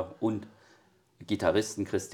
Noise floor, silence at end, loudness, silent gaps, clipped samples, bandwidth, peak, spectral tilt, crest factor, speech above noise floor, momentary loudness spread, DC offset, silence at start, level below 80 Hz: -64 dBFS; 0 s; -31 LUFS; none; under 0.1%; 16.5 kHz; -10 dBFS; -5 dB/octave; 22 dB; 33 dB; 20 LU; under 0.1%; 0 s; -64 dBFS